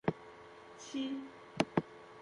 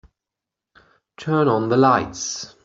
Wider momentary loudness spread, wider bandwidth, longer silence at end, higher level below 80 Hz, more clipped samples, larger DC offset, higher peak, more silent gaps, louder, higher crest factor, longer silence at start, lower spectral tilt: first, 19 LU vs 11 LU; first, 11.5 kHz vs 8 kHz; second, 0 s vs 0.2 s; second, -70 dBFS vs -56 dBFS; neither; neither; second, -16 dBFS vs -2 dBFS; neither; second, -39 LUFS vs -19 LUFS; first, 24 dB vs 18 dB; second, 0.05 s vs 1.2 s; about the same, -5.5 dB/octave vs -5 dB/octave